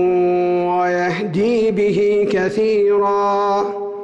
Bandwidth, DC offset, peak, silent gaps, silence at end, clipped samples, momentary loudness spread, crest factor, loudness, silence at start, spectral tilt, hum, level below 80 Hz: 8.4 kHz; under 0.1%; -10 dBFS; none; 0 s; under 0.1%; 4 LU; 8 dB; -17 LUFS; 0 s; -7 dB/octave; none; -54 dBFS